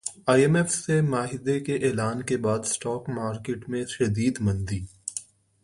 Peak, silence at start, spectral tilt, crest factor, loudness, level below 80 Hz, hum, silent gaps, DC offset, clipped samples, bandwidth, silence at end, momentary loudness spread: -6 dBFS; 0.05 s; -5.5 dB/octave; 20 dB; -26 LUFS; -50 dBFS; none; none; under 0.1%; under 0.1%; 11.5 kHz; 0.4 s; 11 LU